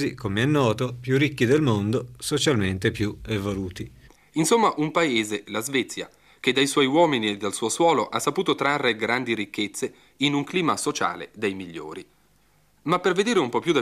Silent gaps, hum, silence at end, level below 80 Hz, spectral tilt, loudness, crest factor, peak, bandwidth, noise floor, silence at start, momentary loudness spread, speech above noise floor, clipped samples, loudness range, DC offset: none; none; 0 s; -56 dBFS; -4.5 dB/octave; -23 LUFS; 16 dB; -8 dBFS; 15.5 kHz; -62 dBFS; 0 s; 12 LU; 39 dB; under 0.1%; 4 LU; under 0.1%